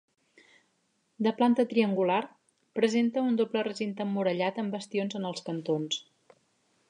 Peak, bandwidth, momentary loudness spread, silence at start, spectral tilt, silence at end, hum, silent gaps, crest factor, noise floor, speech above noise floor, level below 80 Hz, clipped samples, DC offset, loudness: -10 dBFS; 10 kHz; 9 LU; 1.2 s; -5.5 dB/octave; 0.9 s; none; none; 18 dB; -74 dBFS; 46 dB; -82 dBFS; under 0.1%; under 0.1%; -29 LUFS